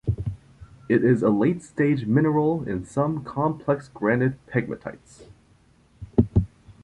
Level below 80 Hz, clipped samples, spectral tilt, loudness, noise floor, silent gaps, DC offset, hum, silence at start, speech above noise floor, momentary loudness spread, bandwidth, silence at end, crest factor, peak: -42 dBFS; under 0.1%; -9 dB/octave; -24 LUFS; -58 dBFS; none; under 0.1%; none; 0.05 s; 35 dB; 13 LU; 10.5 kHz; 0.15 s; 20 dB; -4 dBFS